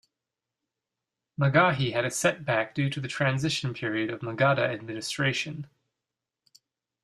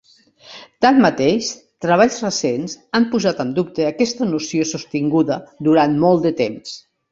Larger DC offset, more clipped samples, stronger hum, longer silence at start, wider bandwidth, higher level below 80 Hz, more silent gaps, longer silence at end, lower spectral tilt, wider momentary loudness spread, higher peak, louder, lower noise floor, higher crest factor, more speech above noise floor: neither; neither; neither; first, 1.4 s vs 0.5 s; first, 13.5 kHz vs 7.8 kHz; second, -64 dBFS vs -56 dBFS; neither; first, 1.4 s vs 0.35 s; about the same, -5 dB/octave vs -5 dB/octave; about the same, 11 LU vs 11 LU; second, -8 dBFS vs -2 dBFS; second, -27 LUFS vs -18 LUFS; first, -88 dBFS vs -46 dBFS; first, 22 dB vs 16 dB; first, 61 dB vs 29 dB